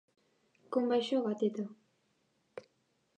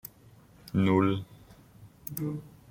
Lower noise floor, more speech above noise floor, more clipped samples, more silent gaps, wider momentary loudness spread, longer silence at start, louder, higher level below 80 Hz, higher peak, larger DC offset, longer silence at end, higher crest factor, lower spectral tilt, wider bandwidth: first, -76 dBFS vs -56 dBFS; first, 44 dB vs 29 dB; neither; neither; about the same, 21 LU vs 21 LU; first, 0.7 s vs 0.05 s; second, -34 LUFS vs -29 LUFS; second, under -90 dBFS vs -62 dBFS; second, -18 dBFS vs -12 dBFS; neither; first, 0.6 s vs 0.2 s; about the same, 18 dB vs 20 dB; second, -6 dB/octave vs -7.5 dB/octave; second, 9.4 kHz vs 16.5 kHz